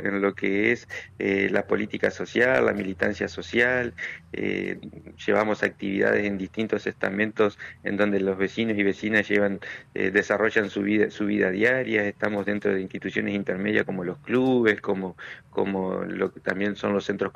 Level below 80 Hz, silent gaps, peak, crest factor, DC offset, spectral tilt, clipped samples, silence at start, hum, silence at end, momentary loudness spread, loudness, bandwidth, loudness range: -60 dBFS; none; -8 dBFS; 18 dB; under 0.1%; -6 dB/octave; under 0.1%; 0 s; none; 0.05 s; 9 LU; -25 LUFS; 9.6 kHz; 2 LU